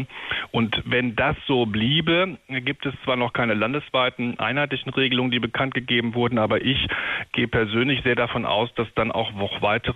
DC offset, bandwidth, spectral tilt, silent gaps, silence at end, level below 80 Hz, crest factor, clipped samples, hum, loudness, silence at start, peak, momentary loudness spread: under 0.1%; 7.2 kHz; -7.5 dB/octave; none; 0 s; -48 dBFS; 14 dB; under 0.1%; none; -23 LUFS; 0 s; -8 dBFS; 5 LU